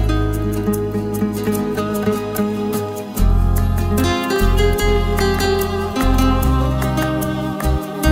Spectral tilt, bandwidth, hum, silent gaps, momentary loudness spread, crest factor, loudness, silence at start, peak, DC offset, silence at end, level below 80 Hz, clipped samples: -6 dB/octave; 16.5 kHz; none; none; 5 LU; 14 dB; -18 LUFS; 0 s; -2 dBFS; under 0.1%; 0 s; -22 dBFS; under 0.1%